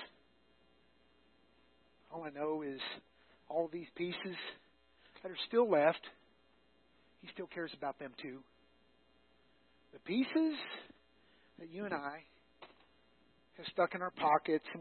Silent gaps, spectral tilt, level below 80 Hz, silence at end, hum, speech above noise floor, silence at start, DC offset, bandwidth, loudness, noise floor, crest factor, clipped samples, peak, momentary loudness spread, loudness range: none; -3 dB/octave; -80 dBFS; 0 s; none; 34 dB; 0 s; under 0.1%; 4.3 kHz; -38 LUFS; -72 dBFS; 24 dB; under 0.1%; -16 dBFS; 20 LU; 11 LU